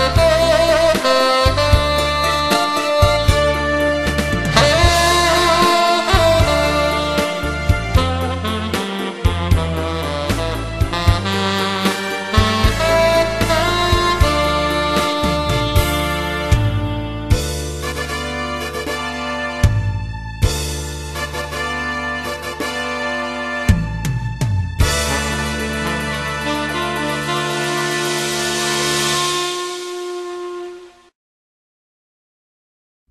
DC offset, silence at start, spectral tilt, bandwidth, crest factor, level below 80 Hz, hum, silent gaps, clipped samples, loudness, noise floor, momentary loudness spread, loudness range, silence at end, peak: under 0.1%; 0 s; -4.5 dB/octave; 13.5 kHz; 18 dB; -26 dBFS; none; none; under 0.1%; -17 LUFS; under -90 dBFS; 10 LU; 7 LU; 2.2 s; 0 dBFS